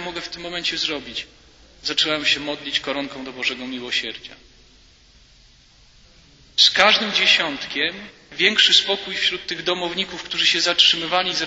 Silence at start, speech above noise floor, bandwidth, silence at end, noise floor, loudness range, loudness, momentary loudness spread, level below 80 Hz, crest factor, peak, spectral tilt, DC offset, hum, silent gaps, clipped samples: 0 s; 31 dB; 8 kHz; 0 s; -52 dBFS; 11 LU; -18 LUFS; 16 LU; -56 dBFS; 22 dB; 0 dBFS; -1 dB/octave; under 0.1%; none; none; under 0.1%